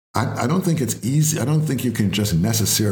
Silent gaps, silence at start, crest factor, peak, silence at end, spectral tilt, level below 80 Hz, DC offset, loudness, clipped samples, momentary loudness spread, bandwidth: none; 0.15 s; 16 dB; -4 dBFS; 0 s; -5 dB/octave; -50 dBFS; under 0.1%; -20 LUFS; under 0.1%; 4 LU; 20 kHz